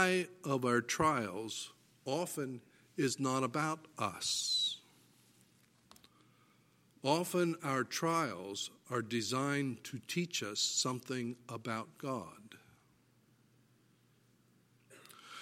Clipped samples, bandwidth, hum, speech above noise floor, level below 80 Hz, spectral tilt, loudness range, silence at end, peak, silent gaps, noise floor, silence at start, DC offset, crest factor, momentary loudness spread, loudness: under 0.1%; 16.5 kHz; none; 34 dB; -74 dBFS; -3.5 dB/octave; 9 LU; 0 s; -14 dBFS; none; -70 dBFS; 0 s; under 0.1%; 24 dB; 13 LU; -36 LUFS